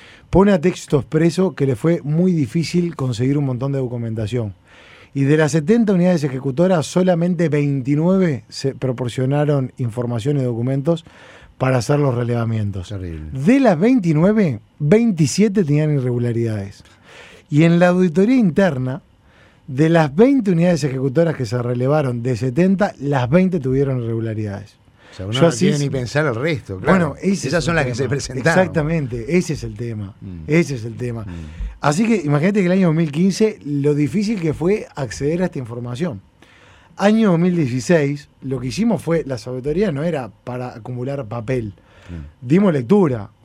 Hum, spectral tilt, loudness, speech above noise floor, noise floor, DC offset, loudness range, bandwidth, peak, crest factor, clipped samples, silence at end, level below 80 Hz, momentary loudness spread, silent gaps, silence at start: none; -7 dB/octave; -18 LUFS; 33 dB; -50 dBFS; under 0.1%; 4 LU; 12.5 kHz; 0 dBFS; 18 dB; under 0.1%; 0.2 s; -44 dBFS; 12 LU; none; 0.3 s